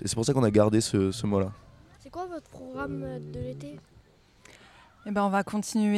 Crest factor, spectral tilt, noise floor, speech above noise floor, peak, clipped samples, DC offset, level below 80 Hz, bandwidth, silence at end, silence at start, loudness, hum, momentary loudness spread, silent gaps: 20 dB; -6 dB/octave; -58 dBFS; 31 dB; -8 dBFS; under 0.1%; under 0.1%; -54 dBFS; 14 kHz; 0 s; 0 s; -28 LUFS; none; 19 LU; none